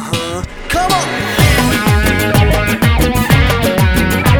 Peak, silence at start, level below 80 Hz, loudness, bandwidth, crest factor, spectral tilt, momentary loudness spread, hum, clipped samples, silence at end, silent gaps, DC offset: 0 dBFS; 0 s; -20 dBFS; -12 LUFS; over 20 kHz; 12 dB; -5 dB/octave; 7 LU; none; under 0.1%; 0 s; none; under 0.1%